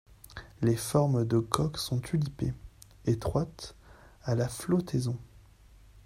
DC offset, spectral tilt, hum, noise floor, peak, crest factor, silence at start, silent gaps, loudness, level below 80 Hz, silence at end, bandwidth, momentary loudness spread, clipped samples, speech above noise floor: under 0.1%; -6.5 dB/octave; none; -56 dBFS; -8 dBFS; 24 dB; 0.3 s; none; -31 LUFS; -52 dBFS; 0.05 s; 16 kHz; 19 LU; under 0.1%; 27 dB